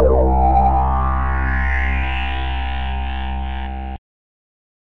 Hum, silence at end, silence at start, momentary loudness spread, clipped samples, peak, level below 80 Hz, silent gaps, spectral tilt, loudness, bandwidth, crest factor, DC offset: none; 0.8 s; 0 s; 12 LU; under 0.1%; -4 dBFS; -20 dBFS; none; -9 dB/octave; -19 LUFS; 4 kHz; 14 dB; 4%